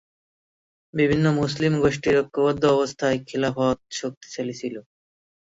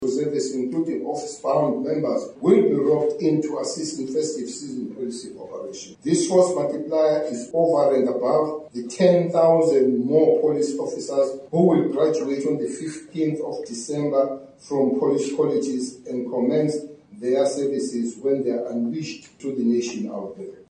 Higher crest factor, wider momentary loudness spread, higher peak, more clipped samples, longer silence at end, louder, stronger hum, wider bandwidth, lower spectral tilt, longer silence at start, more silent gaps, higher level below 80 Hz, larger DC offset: about the same, 18 dB vs 16 dB; about the same, 12 LU vs 14 LU; about the same, -6 dBFS vs -6 dBFS; neither; first, 0.75 s vs 0.1 s; about the same, -23 LUFS vs -22 LUFS; neither; second, 8 kHz vs 10 kHz; about the same, -6 dB/octave vs -6 dB/octave; first, 0.95 s vs 0 s; first, 4.17-4.21 s vs none; first, -52 dBFS vs -70 dBFS; neither